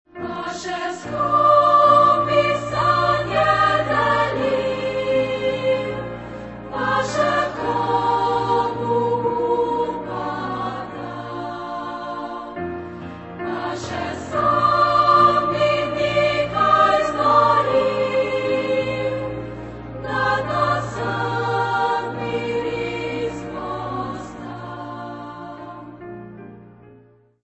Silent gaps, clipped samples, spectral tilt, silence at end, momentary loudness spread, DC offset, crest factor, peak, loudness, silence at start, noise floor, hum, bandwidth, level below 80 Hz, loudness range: none; under 0.1%; -5.5 dB/octave; 0.55 s; 18 LU; under 0.1%; 18 dB; -2 dBFS; -20 LUFS; 0.15 s; -52 dBFS; none; 8.4 kHz; -48 dBFS; 12 LU